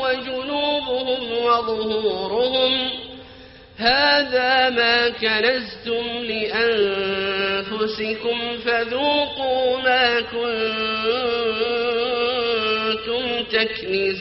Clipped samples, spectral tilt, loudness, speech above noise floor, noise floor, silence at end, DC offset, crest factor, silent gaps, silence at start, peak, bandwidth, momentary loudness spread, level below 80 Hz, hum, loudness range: under 0.1%; 0 dB/octave; -20 LUFS; 23 dB; -43 dBFS; 0 s; under 0.1%; 18 dB; none; 0 s; -4 dBFS; 6 kHz; 7 LU; -52 dBFS; none; 3 LU